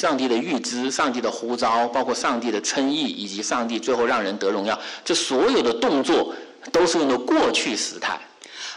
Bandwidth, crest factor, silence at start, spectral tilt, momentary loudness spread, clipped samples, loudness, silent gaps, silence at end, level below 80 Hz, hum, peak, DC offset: 11.5 kHz; 12 dB; 0 s; -2.5 dB/octave; 8 LU; under 0.1%; -22 LUFS; none; 0 s; -60 dBFS; none; -12 dBFS; under 0.1%